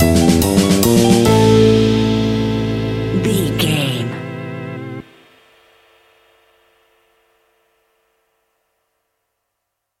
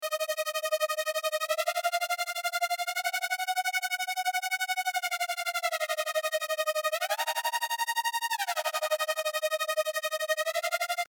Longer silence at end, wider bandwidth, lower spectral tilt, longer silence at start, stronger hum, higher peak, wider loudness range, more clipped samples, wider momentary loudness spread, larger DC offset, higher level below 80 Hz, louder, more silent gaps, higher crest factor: first, 5 s vs 0.05 s; second, 16.5 kHz vs over 20 kHz; first, -5.5 dB/octave vs 5.5 dB/octave; about the same, 0 s vs 0 s; neither; first, 0 dBFS vs -16 dBFS; first, 20 LU vs 0 LU; neither; first, 16 LU vs 1 LU; neither; first, -36 dBFS vs under -90 dBFS; first, -14 LUFS vs -30 LUFS; neither; about the same, 16 dB vs 16 dB